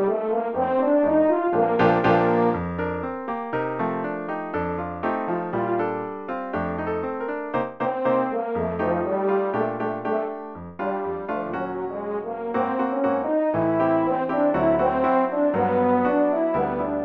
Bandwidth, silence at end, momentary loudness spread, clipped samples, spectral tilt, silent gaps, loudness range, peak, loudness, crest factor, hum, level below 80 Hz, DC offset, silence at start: 6.2 kHz; 0 s; 9 LU; under 0.1%; -9.5 dB/octave; none; 6 LU; -4 dBFS; -24 LUFS; 18 dB; none; -54 dBFS; under 0.1%; 0 s